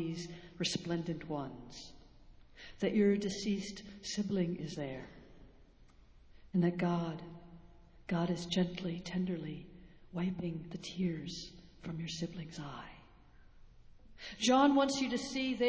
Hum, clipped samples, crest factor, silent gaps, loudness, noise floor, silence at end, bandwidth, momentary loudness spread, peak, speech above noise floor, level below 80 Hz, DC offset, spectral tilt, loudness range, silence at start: none; under 0.1%; 22 dB; none; -36 LUFS; -61 dBFS; 0 s; 8 kHz; 20 LU; -14 dBFS; 25 dB; -62 dBFS; under 0.1%; -5.5 dB/octave; 7 LU; 0 s